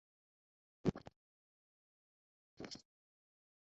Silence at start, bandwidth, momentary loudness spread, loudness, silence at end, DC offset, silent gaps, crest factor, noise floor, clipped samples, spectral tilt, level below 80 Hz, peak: 0.85 s; 7.6 kHz; 16 LU; -45 LUFS; 0.95 s; under 0.1%; 1.16-2.57 s; 28 dB; under -90 dBFS; under 0.1%; -6.5 dB/octave; -68 dBFS; -22 dBFS